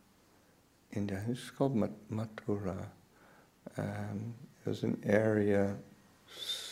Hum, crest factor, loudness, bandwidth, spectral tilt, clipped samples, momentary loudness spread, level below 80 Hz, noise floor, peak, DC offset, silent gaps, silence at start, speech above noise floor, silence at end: none; 22 dB; -36 LUFS; 16 kHz; -6.5 dB/octave; under 0.1%; 16 LU; -70 dBFS; -66 dBFS; -14 dBFS; under 0.1%; none; 0.9 s; 32 dB; 0 s